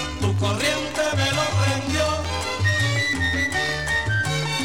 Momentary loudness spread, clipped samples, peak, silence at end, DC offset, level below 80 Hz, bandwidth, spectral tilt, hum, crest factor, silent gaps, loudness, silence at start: 3 LU; under 0.1%; -8 dBFS; 0 s; 0.6%; -38 dBFS; 16.5 kHz; -4 dB/octave; none; 14 dB; none; -22 LUFS; 0 s